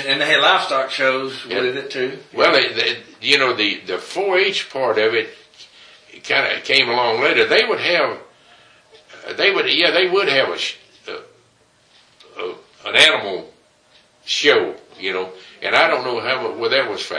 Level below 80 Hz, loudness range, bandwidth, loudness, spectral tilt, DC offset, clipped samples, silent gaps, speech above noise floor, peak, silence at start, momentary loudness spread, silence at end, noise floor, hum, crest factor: -68 dBFS; 3 LU; 10.5 kHz; -17 LUFS; -2.5 dB/octave; under 0.1%; under 0.1%; none; 38 dB; 0 dBFS; 0 s; 17 LU; 0 s; -56 dBFS; none; 20 dB